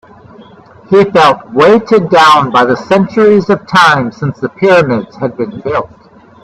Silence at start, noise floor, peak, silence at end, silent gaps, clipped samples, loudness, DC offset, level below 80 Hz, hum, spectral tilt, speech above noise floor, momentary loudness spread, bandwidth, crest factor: 0.9 s; -37 dBFS; 0 dBFS; 0.6 s; none; 0.2%; -9 LUFS; under 0.1%; -48 dBFS; none; -6 dB/octave; 28 dB; 11 LU; 13 kHz; 10 dB